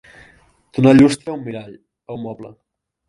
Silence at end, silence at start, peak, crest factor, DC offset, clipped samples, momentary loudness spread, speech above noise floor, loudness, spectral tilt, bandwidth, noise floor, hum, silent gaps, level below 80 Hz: 0.6 s; 0.75 s; 0 dBFS; 18 dB; under 0.1%; under 0.1%; 22 LU; 36 dB; -15 LUFS; -7 dB/octave; 11.5 kHz; -52 dBFS; none; none; -50 dBFS